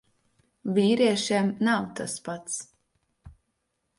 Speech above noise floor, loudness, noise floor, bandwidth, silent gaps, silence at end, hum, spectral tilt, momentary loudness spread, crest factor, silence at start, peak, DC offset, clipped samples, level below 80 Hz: 52 dB; -26 LUFS; -77 dBFS; 11.5 kHz; none; 0.65 s; none; -4.5 dB/octave; 12 LU; 18 dB; 0.65 s; -10 dBFS; under 0.1%; under 0.1%; -62 dBFS